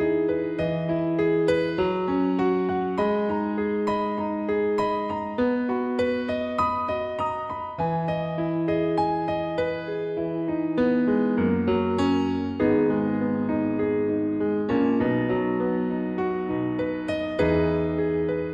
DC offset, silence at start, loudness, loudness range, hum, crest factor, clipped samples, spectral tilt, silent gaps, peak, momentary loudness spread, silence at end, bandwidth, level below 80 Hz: under 0.1%; 0 s; -25 LUFS; 3 LU; none; 14 dB; under 0.1%; -8 dB/octave; none; -10 dBFS; 5 LU; 0 s; 8.4 kHz; -50 dBFS